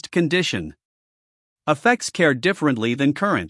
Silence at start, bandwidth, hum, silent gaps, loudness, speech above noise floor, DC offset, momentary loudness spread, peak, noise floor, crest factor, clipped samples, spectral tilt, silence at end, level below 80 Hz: 0.05 s; 12 kHz; none; 0.85-1.56 s; -20 LUFS; over 70 dB; under 0.1%; 9 LU; -2 dBFS; under -90 dBFS; 18 dB; under 0.1%; -5 dB/octave; 0 s; -60 dBFS